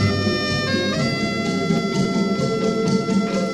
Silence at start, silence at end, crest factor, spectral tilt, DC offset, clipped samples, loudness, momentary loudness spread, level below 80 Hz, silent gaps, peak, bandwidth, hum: 0 s; 0 s; 14 dB; -5.5 dB/octave; under 0.1%; under 0.1%; -20 LUFS; 2 LU; -48 dBFS; none; -6 dBFS; 12.5 kHz; none